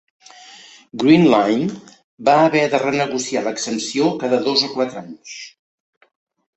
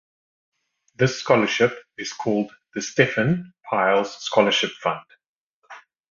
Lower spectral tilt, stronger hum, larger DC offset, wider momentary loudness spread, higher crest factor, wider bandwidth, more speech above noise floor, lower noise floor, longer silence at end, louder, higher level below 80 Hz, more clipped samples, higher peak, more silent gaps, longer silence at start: about the same, -4.5 dB/octave vs -4.5 dB/octave; neither; neither; first, 21 LU vs 11 LU; about the same, 18 dB vs 22 dB; first, 8.4 kHz vs 7.4 kHz; about the same, 26 dB vs 25 dB; second, -43 dBFS vs -47 dBFS; first, 1.1 s vs 0.35 s; first, -17 LUFS vs -22 LUFS; about the same, -62 dBFS vs -60 dBFS; neither; about the same, -2 dBFS vs -2 dBFS; second, 2.04-2.18 s vs 5.27-5.62 s; about the same, 0.95 s vs 1 s